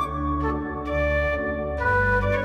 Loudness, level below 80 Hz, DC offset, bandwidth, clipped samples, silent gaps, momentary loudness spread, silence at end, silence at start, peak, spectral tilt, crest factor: -24 LUFS; -32 dBFS; under 0.1%; 11 kHz; under 0.1%; none; 7 LU; 0 s; 0 s; -12 dBFS; -7.5 dB/octave; 12 dB